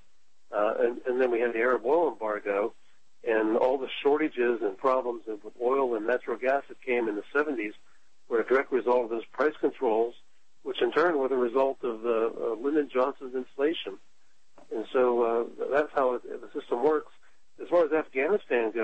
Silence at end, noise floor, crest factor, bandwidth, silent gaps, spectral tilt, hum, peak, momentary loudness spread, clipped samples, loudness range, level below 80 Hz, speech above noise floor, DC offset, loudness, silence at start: 0 s; -71 dBFS; 16 dB; 8.4 kHz; none; -6 dB/octave; none; -12 dBFS; 10 LU; under 0.1%; 2 LU; -72 dBFS; 44 dB; 0.4%; -28 LUFS; 0.5 s